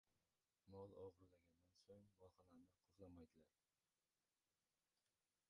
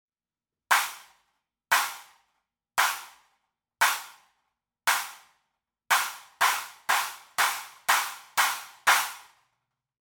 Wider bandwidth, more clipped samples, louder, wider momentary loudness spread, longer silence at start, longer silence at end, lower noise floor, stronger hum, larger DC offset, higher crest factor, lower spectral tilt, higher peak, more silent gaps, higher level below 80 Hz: second, 6.2 kHz vs 19 kHz; neither; second, -64 LUFS vs -26 LUFS; about the same, 8 LU vs 10 LU; second, 0.05 s vs 0.7 s; first, 2 s vs 0.8 s; about the same, under -90 dBFS vs under -90 dBFS; neither; neither; about the same, 22 dB vs 24 dB; first, -7.5 dB/octave vs 2.5 dB/octave; second, -48 dBFS vs -6 dBFS; neither; second, -86 dBFS vs -80 dBFS